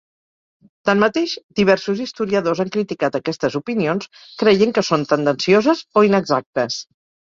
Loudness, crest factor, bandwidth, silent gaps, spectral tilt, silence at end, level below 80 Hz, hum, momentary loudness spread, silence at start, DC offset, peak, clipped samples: -18 LUFS; 18 dB; 7.6 kHz; 1.43-1.49 s, 6.46-6.53 s; -5.5 dB/octave; 0.55 s; -58 dBFS; none; 8 LU; 0.85 s; under 0.1%; -2 dBFS; under 0.1%